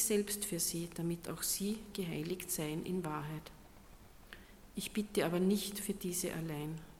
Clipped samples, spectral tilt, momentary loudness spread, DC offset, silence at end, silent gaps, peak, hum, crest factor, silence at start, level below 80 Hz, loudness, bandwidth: under 0.1%; -4 dB/octave; 15 LU; under 0.1%; 0 s; none; -20 dBFS; none; 18 dB; 0 s; -60 dBFS; -37 LUFS; 17.5 kHz